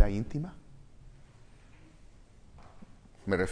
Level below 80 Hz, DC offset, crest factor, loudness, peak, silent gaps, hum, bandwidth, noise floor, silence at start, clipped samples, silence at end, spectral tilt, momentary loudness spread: -44 dBFS; under 0.1%; 26 dB; -35 LUFS; -8 dBFS; none; none; 10.5 kHz; -55 dBFS; 0 s; under 0.1%; 0 s; -7 dB/octave; 27 LU